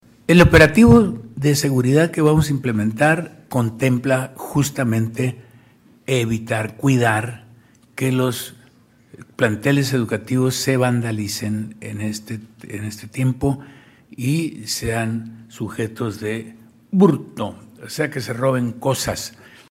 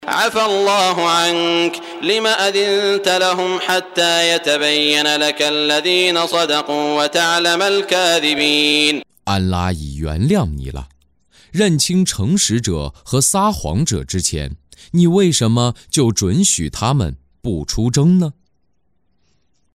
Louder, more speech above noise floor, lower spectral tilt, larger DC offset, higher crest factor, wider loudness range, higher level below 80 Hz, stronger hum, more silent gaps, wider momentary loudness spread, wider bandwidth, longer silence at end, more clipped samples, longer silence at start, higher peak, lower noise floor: second, -19 LUFS vs -15 LUFS; second, 34 dB vs 51 dB; first, -6 dB/octave vs -3.5 dB/octave; neither; about the same, 18 dB vs 16 dB; first, 8 LU vs 4 LU; about the same, -40 dBFS vs -36 dBFS; neither; neither; first, 15 LU vs 9 LU; about the same, 16 kHz vs 16 kHz; second, 0.4 s vs 1.45 s; neither; first, 0.3 s vs 0 s; about the same, -2 dBFS vs 0 dBFS; second, -52 dBFS vs -67 dBFS